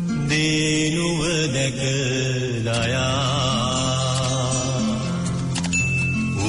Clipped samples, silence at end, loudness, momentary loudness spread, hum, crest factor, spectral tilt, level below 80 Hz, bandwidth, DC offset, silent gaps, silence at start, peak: under 0.1%; 0 s; -21 LUFS; 4 LU; none; 10 dB; -4 dB/octave; -42 dBFS; 11 kHz; under 0.1%; none; 0 s; -10 dBFS